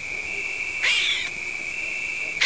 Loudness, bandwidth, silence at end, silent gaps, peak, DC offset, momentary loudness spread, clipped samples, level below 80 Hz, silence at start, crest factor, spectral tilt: -24 LUFS; 8 kHz; 0 s; none; -8 dBFS; 0.4%; 8 LU; under 0.1%; -56 dBFS; 0 s; 20 dB; 0.5 dB/octave